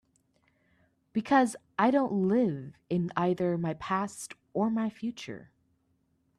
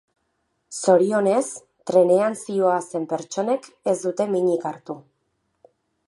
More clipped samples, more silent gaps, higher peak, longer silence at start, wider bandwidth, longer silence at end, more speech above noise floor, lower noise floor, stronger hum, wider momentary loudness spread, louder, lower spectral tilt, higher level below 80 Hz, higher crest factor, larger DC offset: neither; neither; second, -12 dBFS vs -4 dBFS; first, 1.15 s vs 0.7 s; first, 13 kHz vs 11.5 kHz; about the same, 0.95 s vs 1.05 s; second, 44 dB vs 51 dB; about the same, -73 dBFS vs -72 dBFS; neither; about the same, 14 LU vs 16 LU; second, -29 LUFS vs -22 LUFS; about the same, -6.5 dB/octave vs -5.5 dB/octave; first, -70 dBFS vs -76 dBFS; about the same, 18 dB vs 20 dB; neither